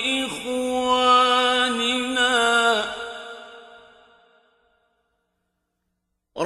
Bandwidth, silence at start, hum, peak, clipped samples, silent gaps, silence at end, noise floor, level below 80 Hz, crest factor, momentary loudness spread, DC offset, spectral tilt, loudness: 15 kHz; 0 s; none; -6 dBFS; under 0.1%; none; 0 s; -77 dBFS; -60 dBFS; 18 dB; 19 LU; under 0.1%; -1.5 dB/octave; -20 LUFS